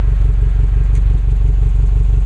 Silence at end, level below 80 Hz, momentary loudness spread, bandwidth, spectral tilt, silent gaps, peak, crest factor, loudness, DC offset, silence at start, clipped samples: 0 s; -12 dBFS; 1 LU; 2.9 kHz; -9 dB/octave; none; -4 dBFS; 6 dB; -16 LUFS; under 0.1%; 0 s; under 0.1%